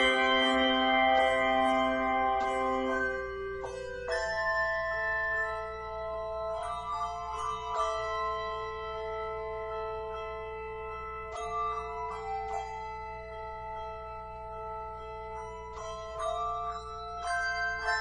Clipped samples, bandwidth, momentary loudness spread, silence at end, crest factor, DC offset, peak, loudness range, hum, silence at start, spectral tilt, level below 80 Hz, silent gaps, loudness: under 0.1%; 10.5 kHz; 15 LU; 0 s; 18 dB; 0.1%; -14 dBFS; 11 LU; none; 0 s; -3.5 dB/octave; -52 dBFS; none; -32 LUFS